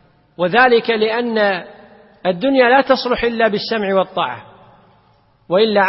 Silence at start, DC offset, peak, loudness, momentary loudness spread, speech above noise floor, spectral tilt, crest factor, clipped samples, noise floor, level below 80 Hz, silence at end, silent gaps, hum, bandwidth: 0.4 s; under 0.1%; 0 dBFS; -16 LUFS; 10 LU; 40 dB; -8.5 dB/octave; 16 dB; under 0.1%; -54 dBFS; -50 dBFS; 0 s; none; none; 5.8 kHz